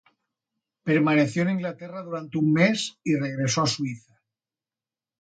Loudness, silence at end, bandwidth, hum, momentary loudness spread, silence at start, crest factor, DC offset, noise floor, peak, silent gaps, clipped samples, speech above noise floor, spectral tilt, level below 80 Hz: -24 LUFS; 1.2 s; 9.4 kHz; none; 13 LU; 0.85 s; 20 dB; under 0.1%; under -90 dBFS; -6 dBFS; none; under 0.1%; over 66 dB; -5 dB/octave; -68 dBFS